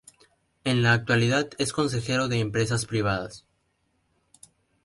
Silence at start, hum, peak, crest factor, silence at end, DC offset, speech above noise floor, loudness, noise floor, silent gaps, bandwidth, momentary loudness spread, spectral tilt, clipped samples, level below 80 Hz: 0.65 s; none; -8 dBFS; 18 dB; 1.45 s; under 0.1%; 47 dB; -25 LUFS; -72 dBFS; none; 11.5 kHz; 7 LU; -5 dB/octave; under 0.1%; -54 dBFS